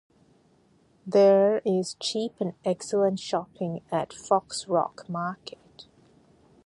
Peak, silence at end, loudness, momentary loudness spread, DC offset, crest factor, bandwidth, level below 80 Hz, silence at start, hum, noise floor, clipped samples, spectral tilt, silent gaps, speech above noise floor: -8 dBFS; 0.85 s; -26 LUFS; 14 LU; under 0.1%; 18 dB; 11.5 kHz; -70 dBFS; 1.05 s; none; -62 dBFS; under 0.1%; -5 dB/octave; none; 37 dB